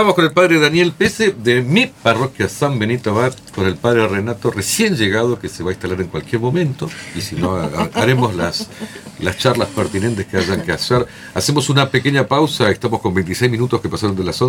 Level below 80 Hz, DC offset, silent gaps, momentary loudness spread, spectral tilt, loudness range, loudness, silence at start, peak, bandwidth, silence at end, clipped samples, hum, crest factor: -46 dBFS; under 0.1%; none; 9 LU; -5 dB/octave; 3 LU; -17 LUFS; 0 s; 0 dBFS; 19.5 kHz; 0 s; under 0.1%; none; 16 dB